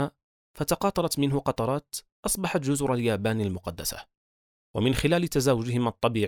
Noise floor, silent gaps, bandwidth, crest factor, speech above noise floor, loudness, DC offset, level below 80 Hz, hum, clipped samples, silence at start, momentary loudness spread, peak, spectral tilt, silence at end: under -90 dBFS; 0.24-0.54 s, 2.12-2.23 s, 4.17-4.74 s; over 20 kHz; 18 dB; over 64 dB; -27 LUFS; under 0.1%; -48 dBFS; none; under 0.1%; 0 s; 9 LU; -8 dBFS; -5 dB/octave; 0 s